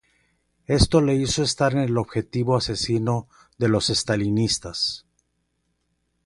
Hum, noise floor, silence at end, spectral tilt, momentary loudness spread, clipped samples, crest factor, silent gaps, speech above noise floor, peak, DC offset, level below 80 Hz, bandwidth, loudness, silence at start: 60 Hz at -45 dBFS; -72 dBFS; 1.25 s; -5 dB/octave; 7 LU; under 0.1%; 20 dB; none; 50 dB; -4 dBFS; under 0.1%; -38 dBFS; 11.5 kHz; -22 LUFS; 0.7 s